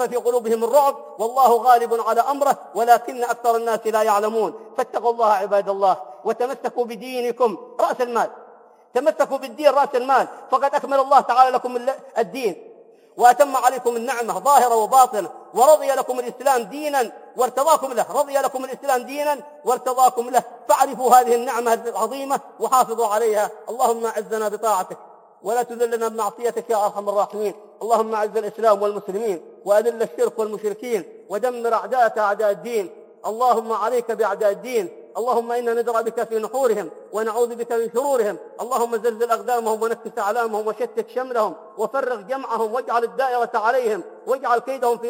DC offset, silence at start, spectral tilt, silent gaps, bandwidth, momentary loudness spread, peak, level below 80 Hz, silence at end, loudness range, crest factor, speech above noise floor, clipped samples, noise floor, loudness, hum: under 0.1%; 0 s; -3 dB/octave; none; 17 kHz; 10 LU; 0 dBFS; -84 dBFS; 0 s; 5 LU; 20 dB; 27 dB; under 0.1%; -48 dBFS; -21 LUFS; none